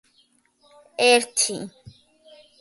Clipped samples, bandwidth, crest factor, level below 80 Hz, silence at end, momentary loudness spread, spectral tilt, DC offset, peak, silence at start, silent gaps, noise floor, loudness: under 0.1%; 12 kHz; 20 dB; -68 dBFS; 0.9 s; 21 LU; -1 dB/octave; under 0.1%; -4 dBFS; 1 s; none; -63 dBFS; -19 LUFS